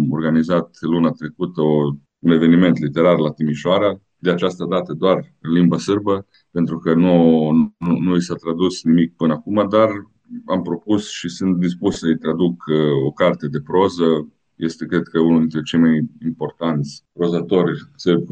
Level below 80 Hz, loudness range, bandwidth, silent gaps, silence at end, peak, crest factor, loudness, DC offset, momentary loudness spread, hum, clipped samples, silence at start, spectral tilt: -56 dBFS; 3 LU; 8.8 kHz; none; 0 s; -2 dBFS; 16 dB; -18 LUFS; under 0.1%; 9 LU; none; under 0.1%; 0 s; -7 dB/octave